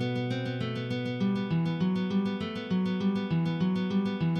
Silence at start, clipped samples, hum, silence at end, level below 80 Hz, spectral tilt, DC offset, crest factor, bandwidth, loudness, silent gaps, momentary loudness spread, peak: 0 s; under 0.1%; none; 0 s; -64 dBFS; -8 dB/octave; under 0.1%; 12 dB; 6.6 kHz; -30 LUFS; none; 4 LU; -18 dBFS